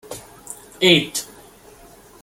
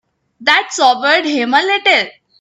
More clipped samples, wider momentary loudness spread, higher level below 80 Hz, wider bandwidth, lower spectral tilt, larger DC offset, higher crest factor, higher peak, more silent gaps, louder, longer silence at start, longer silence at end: neither; first, 22 LU vs 4 LU; first, -58 dBFS vs -66 dBFS; first, 17 kHz vs 11 kHz; first, -3.5 dB/octave vs -1 dB/octave; neither; first, 22 dB vs 14 dB; about the same, -2 dBFS vs 0 dBFS; neither; second, -17 LUFS vs -12 LUFS; second, 0.1 s vs 0.4 s; first, 0.95 s vs 0.3 s